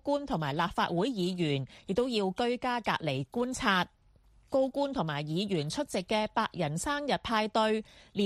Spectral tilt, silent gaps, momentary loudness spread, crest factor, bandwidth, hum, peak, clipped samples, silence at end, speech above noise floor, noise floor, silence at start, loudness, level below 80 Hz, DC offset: -5 dB/octave; none; 5 LU; 22 dB; 14.5 kHz; none; -10 dBFS; under 0.1%; 0 s; 32 dB; -62 dBFS; 0.05 s; -31 LUFS; -58 dBFS; under 0.1%